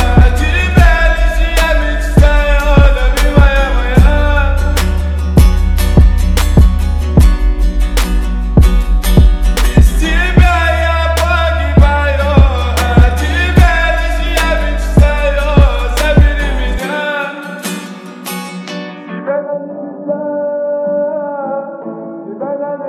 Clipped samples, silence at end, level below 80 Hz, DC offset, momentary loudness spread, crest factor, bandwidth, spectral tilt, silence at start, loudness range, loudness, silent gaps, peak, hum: 0.7%; 0 s; -12 dBFS; under 0.1%; 12 LU; 10 dB; 14.5 kHz; -6 dB/octave; 0 s; 8 LU; -12 LUFS; none; 0 dBFS; none